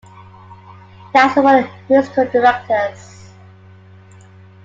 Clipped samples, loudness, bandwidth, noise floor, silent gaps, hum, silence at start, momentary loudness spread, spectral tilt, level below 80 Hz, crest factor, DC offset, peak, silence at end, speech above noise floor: under 0.1%; -14 LUFS; 7.8 kHz; -42 dBFS; none; none; 1.15 s; 8 LU; -5.5 dB/octave; -60 dBFS; 16 dB; under 0.1%; 0 dBFS; 1.7 s; 28 dB